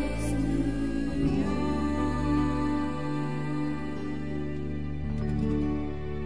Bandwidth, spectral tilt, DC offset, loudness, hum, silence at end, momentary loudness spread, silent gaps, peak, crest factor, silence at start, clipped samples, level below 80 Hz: 11 kHz; -7.5 dB/octave; 1%; -30 LUFS; none; 0 s; 7 LU; none; -16 dBFS; 14 dB; 0 s; under 0.1%; -38 dBFS